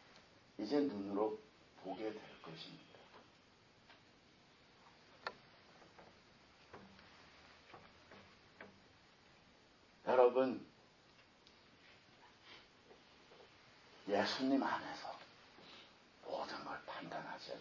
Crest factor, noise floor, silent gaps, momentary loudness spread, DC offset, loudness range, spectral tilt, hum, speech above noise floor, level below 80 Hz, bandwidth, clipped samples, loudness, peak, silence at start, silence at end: 28 dB; -68 dBFS; none; 27 LU; under 0.1%; 21 LU; -5 dB/octave; none; 30 dB; -80 dBFS; 7.4 kHz; under 0.1%; -40 LUFS; -16 dBFS; 0.15 s; 0 s